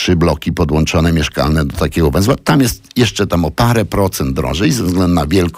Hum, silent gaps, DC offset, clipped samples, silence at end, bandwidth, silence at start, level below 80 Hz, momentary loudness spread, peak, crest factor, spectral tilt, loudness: none; none; under 0.1%; under 0.1%; 0 s; 16.5 kHz; 0 s; -26 dBFS; 3 LU; -2 dBFS; 12 dB; -5.5 dB/octave; -14 LUFS